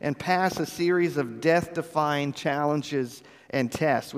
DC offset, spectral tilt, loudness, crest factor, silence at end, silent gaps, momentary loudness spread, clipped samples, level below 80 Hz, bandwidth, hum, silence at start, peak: under 0.1%; -5.5 dB/octave; -26 LUFS; 18 dB; 0 s; none; 7 LU; under 0.1%; -62 dBFS; 15.5 kHz; none; 0 s; -8 dBFS